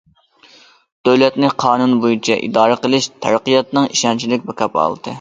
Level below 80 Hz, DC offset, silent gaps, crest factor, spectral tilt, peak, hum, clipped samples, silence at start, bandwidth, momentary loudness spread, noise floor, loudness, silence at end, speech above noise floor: -60 dBFS; under 0.1%; none; 16 dB; -4 dB/octave; 0 dBFS; none; under 0.1%; 1.05 s; 9.2 kHz; 6 LU; -49 dBFS; -15 LUFS; 0 s; 34 dB